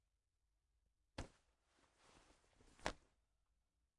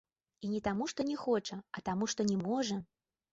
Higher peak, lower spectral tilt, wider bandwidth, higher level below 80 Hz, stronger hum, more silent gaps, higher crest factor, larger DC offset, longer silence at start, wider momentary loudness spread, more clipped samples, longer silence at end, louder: second, -24 dBFS vs -20 dBFS; second, -3.5 dB/octave vs -5 dB/octave; first, 11 kHz vs 8 kHz; about the same, -68 dBFS vs -66 dBFS; neither; neither; first, 36 dB vs 16 dB; neither; first, 1.2 s vs 0.4 s; about the same, 11 LU vs 9 LU; neither; first, 1 s vs 0.5 s; second, -53 LUFS vs -36 LUFS